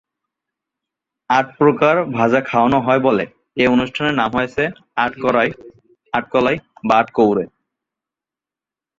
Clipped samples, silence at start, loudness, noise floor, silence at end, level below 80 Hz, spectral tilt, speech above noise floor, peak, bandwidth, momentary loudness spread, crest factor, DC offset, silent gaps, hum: under 0.1%; 1.3 s; -17 LUFS; -89 dBFS; 1.55 s; -52 dBFS; -6.5 dB/octave; 73 dB; -2 dBFS; 7.6 kHz; 8 LU; 18 dB; under 0.1%; none; none